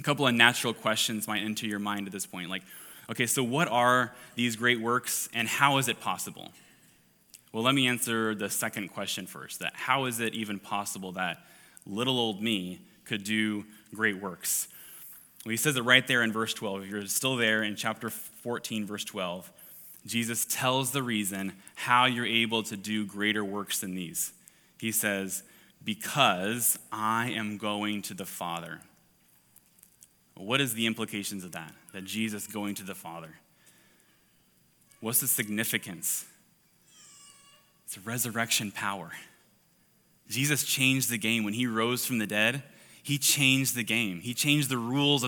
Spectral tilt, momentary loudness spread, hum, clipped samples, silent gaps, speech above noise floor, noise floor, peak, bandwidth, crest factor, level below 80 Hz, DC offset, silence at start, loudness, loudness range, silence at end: -3 dB/octave; 16 LU; none; under 0.1%; none; 36 dB; -66 dBFS; -4 dBFS; 19 kHz; 26 dB; -78 dBFS; under 0.1%; 0 s; -28 LUFS; 7 LU; 0 s